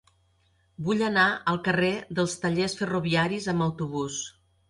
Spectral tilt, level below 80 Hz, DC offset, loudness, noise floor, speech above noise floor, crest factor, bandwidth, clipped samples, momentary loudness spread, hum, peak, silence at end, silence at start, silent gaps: -5 dB/octave; -58 dBFS; under 0.1%; -26 LUFS; -66 dBFS; 40 dB; 18 dB; 11.5 kHz; under 0.1%; 9 LU; none; -10 dBFS; 0.4 s; 0.8 s; none